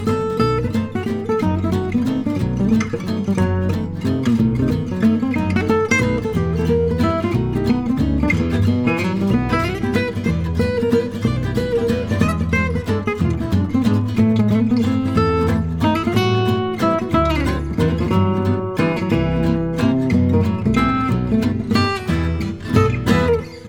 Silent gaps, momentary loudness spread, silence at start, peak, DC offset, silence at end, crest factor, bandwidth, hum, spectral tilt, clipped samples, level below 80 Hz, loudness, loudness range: none; 4 LU; 0 s; -2 dBFS; 0.1%; 0 s; 16 dB; 16.5 kHz; none; -7.5 dB/octave; under 0.1%; -32 dBFS; -18 LUFS; 2 LU